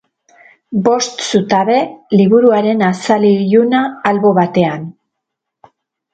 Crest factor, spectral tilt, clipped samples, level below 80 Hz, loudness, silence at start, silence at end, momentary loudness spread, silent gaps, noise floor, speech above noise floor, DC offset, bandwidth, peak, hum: 14 dB; -5.5 dB/octave; under 0.1%; -58 dBFS; -13 LUFS; 0.7 s; 1.2 s; 6 LU; none; -77 dBFS; 65 dB; under 0.1%; 9 kHz; 0 dBFS; none